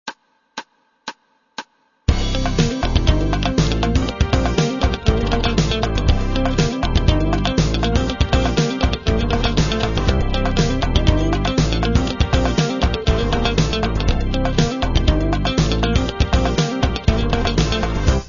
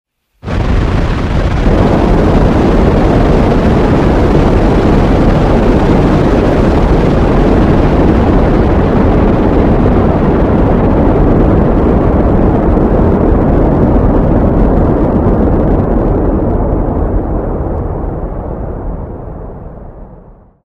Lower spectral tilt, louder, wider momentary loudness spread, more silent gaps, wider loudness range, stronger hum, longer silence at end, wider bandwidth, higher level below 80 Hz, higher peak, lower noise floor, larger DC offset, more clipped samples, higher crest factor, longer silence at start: second, -5.5 dB/octave vs -9 dB/octave; second, -19 LUFS vs -10 LUFS; second, 3 LU vs 9 LU; neither; second, 1 LU vs 6 LU; neither; second, 0 s vs 0.35 s; about the same, 7.4 kHz vs 7.8 kHz; second, -22 dBFS vs -14 dBFS; about the same, 0 dBFS vs 0 dBFS; about the same, -38 dBFS vs -36 dBFS; second, under 0.1% vs 0.4%; second, under 0.1% vs 0.3%; first, 18 dB vs 8 dB; second, 0.05 s vs 0.45 s